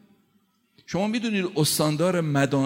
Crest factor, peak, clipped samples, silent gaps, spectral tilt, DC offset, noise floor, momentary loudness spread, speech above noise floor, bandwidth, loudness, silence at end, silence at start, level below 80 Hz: 16 dB; -8 dBFS; under 0.1%; none; -5 dB/octave; under 0.1%; -66 dBFS; 5 LU; 43 dB; 16.5 kHz; -24 LUFS; 0 s; 0.9 s; -64 dBFS